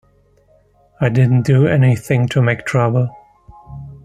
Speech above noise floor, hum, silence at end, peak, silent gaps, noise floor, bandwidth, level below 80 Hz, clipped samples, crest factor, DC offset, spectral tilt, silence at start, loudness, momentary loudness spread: 40 dB; none; 0.1 s; 0 dBFS; none; -54 dBFS; 12 kHz; -48 dBFS; under 0.1%; 16 dB; under 0.1%; -8 dB/octave; 1 s; -15 LUFS; 15 LU